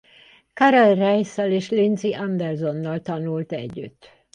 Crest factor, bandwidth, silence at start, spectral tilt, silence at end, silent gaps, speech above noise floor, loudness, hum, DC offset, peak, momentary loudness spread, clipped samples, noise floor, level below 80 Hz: 18 dB; 9.8 kHz; 0.55 s; -6.5 dB/octave; 0.45 s; none; 32 dB; -21 LUFS; none; under 0.1%; -4 dBFS; 15 LU; under 0.1%; -52 dBFS; -64 dBFS